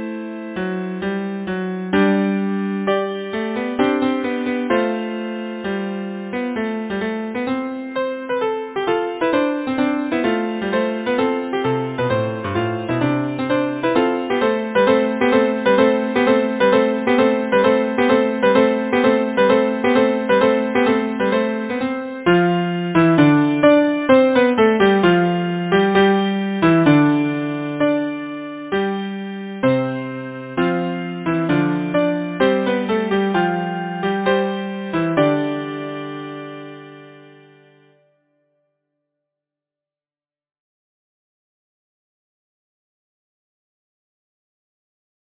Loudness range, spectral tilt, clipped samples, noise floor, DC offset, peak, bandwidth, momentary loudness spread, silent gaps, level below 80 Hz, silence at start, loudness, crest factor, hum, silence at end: 8 LU; -10.5 dB/octave; under 0.1%; under -90 dBFS; under 0.1%; 0 dBFS; 4 kHz; 11 LU; none; -54 dBFS; 0 s; -18 LUFS; 18 dB; none; 8.1 s